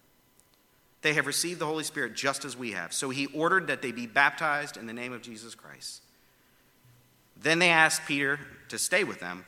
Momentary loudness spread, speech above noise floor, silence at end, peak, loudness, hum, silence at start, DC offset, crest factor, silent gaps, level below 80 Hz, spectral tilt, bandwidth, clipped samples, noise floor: 19 LU; 36 dB; 0.05 s; -4 dBFS; -27 LUFS; none; 1.05 s; under 0.1%; 26 dB; none; -74 dBFS; -2.5 dB/octave; 17.5 kHz; under 0.1%; -65 dBFS